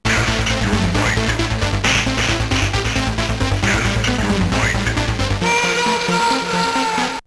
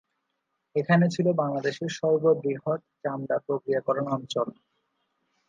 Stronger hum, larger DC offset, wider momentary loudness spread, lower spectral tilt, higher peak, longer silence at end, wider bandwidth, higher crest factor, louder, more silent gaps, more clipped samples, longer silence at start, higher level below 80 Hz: neither; neither; second, 3 LU vs 9 LU; second, -4 dB/octave vs -7 dB/octave; first, -4 dBFS vs -8 dBFS; second, 0.05 s vs 1 s; first, 11 kHz vs 7.6 kHz; second, 14 dB vs 20 dB; first, -17 LUFS vs -27 LUFS; neither; neither; second, 0.05 s vs 0.75 s; first, -28 dBFS vs -74 dBFS